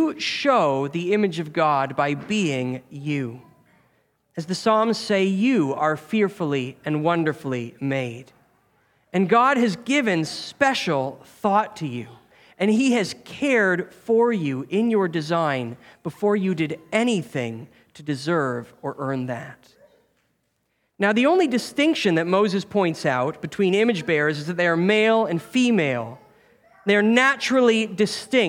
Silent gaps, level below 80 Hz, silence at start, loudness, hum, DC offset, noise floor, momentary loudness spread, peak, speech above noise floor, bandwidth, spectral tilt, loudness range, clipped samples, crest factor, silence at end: none; -68 dBFS; 0 s; -22 LUFS; none; under 0.1%; -72 dBFS; 12 LU; -2 dBFS; 50 dB; 16 kHz; -5.5 dB/octave; 5 LU; under 0.1%; 20 dB; 0 s